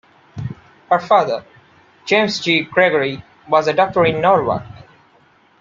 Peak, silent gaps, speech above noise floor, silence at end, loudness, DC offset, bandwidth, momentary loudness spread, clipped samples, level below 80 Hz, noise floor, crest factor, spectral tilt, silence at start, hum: -2 dBFS; none; 37 dB; 0.9 s; -16 LUFS; under 0.1%; 7.6 kHz; 16 LU; under 0.1%; -54 dBFS; -53 dBFS; 18 dB; -5 dB/octave; 0.35 s; none